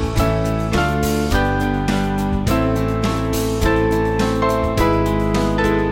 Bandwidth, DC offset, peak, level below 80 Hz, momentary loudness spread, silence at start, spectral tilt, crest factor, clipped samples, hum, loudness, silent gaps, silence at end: 17 kHz; under 0.1%; -2 dBFS; -26 dBFS; 3 LU; 0 s; -6 dB/octave; 14 dB; under 0.1%; none; -18 LUFS; none; 0 s